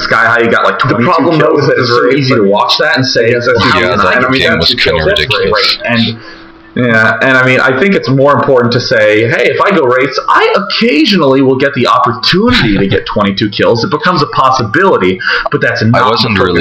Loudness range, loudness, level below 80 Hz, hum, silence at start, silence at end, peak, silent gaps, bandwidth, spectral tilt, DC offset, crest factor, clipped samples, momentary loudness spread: 1 LU; -8 LUFS; -34 dBFS; none; 0 s; 0 s; 0 dBFS; none; 14.5 kHz; -5.5 dB/octave; under 0.1%; 8 dB; 0.4%; 3 LU